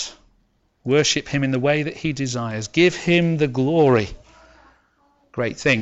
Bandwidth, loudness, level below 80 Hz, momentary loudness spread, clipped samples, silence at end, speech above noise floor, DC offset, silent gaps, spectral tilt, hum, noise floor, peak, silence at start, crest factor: 8.2 kHz; -20 LUFS; -50 dBFS; 10 LU; under 0.1%; 0 s; 44 dB; under 0.1%; none; -5 dB/octave; none; -64 dBFS; -4 dBFS; 0 s; 16 dB